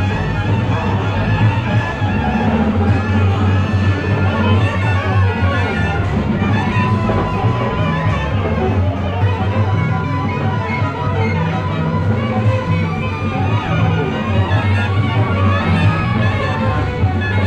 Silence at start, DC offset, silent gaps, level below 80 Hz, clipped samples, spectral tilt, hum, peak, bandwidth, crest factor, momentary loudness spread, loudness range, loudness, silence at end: 0 s; under 0.1%; none; -30 dBFS; under 0.1%; -8 dB/octave; none; -2 dBFS; 7.4 kHz; 12 dB; 3 LU; 2 LU; -16 LUFS; 0 s